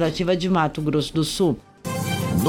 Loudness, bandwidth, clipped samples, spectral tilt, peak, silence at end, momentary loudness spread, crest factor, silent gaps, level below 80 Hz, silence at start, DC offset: -23 LUFS; 17.5 kHz; under 0.1%; -5.5 dB/octave; -6 dBFS; 0 s; 7 LU; 16 dB; none; -44 dBFS; 0 s; under 0.1%